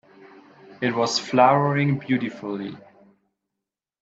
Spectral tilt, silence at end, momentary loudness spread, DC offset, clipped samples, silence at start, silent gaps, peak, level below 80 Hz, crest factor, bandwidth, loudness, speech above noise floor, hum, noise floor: -5.5 dB/octave; 1.2 s; 14 LU; under 0.1%; under 0.1%; 0.2 s; none; -2 dBFS; -68 dBFS; 22 dB; 8 kHz; -22 LUFS; 64 dB; none; -86 dBFS